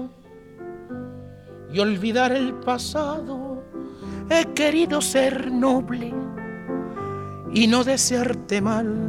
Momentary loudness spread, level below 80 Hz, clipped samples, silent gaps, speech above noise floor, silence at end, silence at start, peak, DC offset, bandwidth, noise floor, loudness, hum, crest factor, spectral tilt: 17 LU; -52 dBFS; under 0.1%; none; 24 dB; 0 s; 0 s; -4 dBFS; under 0.1%; 16 kHz; -46 dBFS; -22 LUFS; none; 20 dB; -4 dB/octave